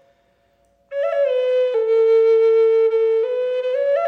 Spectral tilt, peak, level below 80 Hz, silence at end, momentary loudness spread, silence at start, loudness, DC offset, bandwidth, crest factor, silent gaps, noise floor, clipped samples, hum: -2.5 dB/octave; -10 dBFS; -74 dBFS; 0 s; 7 LU; 0.9 s; -17 LUFS; under 0.1%; 4.8 kHz; 8 dB; none; -61 dBFS; under 0.1%; none